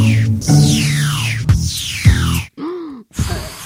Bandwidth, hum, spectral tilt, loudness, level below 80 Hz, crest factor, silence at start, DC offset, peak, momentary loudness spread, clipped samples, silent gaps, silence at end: 16.5 kHz; none; -5 dB/octave; -15 LUFS; -26 dBFS; 14 dB; 0 s; under 0.1%; 0 dBFS; 14 LU; under 0.1%; none; 0 s